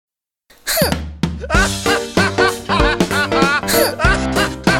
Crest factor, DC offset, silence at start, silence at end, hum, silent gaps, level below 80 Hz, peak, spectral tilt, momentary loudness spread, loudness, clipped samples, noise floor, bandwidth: 16 dB; under 0.1%; 0.65 s; 0 s; none; none; -28 dBFS; 0 dBFS; -4 dB/octave; 5 LU; -16 LUFS; under 0.1%; -54 dBFS; over 20 kHz